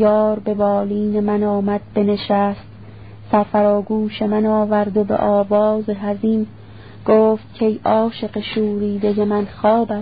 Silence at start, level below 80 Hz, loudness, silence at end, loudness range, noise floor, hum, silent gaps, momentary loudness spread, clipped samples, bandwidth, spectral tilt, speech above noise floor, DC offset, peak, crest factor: 0 s; -50 dBFS; -18 LUFS; 0 s; 2 LU; -38 dBFS; none; none; 6 LU; under 0.1%; 5 kHz; -12 dB/octave; 21 dB; 0.5%; -2 dBFS; 16 dB